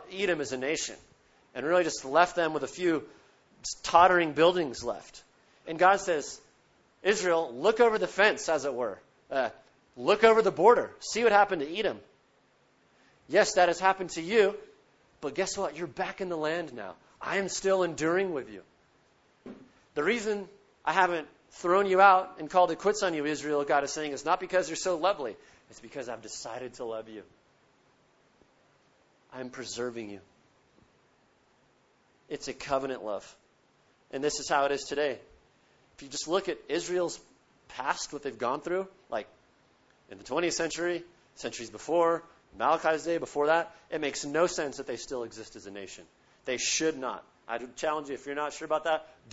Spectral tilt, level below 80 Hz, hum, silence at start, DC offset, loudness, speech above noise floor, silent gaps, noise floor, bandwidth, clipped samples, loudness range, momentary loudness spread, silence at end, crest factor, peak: -3 dB/octave; -64 dBFS; none; 0 s; under 0.1%; -29 LUFS; 38 dB; none; -67 dBFS; 8 kHz; under 0.1%; 14 LU; 18 LU; 0.25 s; 24 dB; -6 dBFS